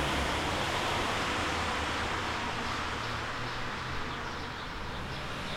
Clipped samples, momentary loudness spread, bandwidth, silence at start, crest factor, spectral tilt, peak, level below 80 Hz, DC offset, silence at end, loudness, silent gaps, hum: under 0.1%; 7 LU; 16.5 kHz; 0 s; 14 dB; -3.5 dB/octave; -18 dBFS; -46 dBFS; under 0.1%; 0 s; -33 LUFS; none; none